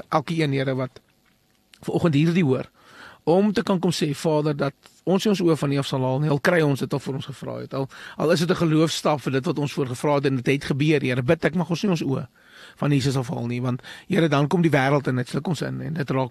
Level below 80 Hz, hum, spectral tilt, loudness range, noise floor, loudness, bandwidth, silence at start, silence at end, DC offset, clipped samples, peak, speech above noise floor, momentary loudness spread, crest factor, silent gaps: -58 dBFS; none; -6.5 dB/octave; 2 LU; -63 dBFS; -23 LUFS; 13 kHz; 0.1 s; 0 s; under 0.1%; under 0.1%; -6 dBFS; 40 dB; 10 LU; 18 dB; none